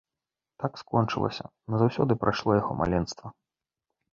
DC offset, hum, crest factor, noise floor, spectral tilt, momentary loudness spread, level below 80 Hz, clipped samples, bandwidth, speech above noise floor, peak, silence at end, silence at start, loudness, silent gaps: under 0.1%; none; 22 dB; -89 dBFS; -7 dB/octave; 12 LU; -50 dBFS; under 0.1%; 7.4 kHz; 62 dB; -6 dBFS; 0.8 s; 0.6 s; -28 LUFS; none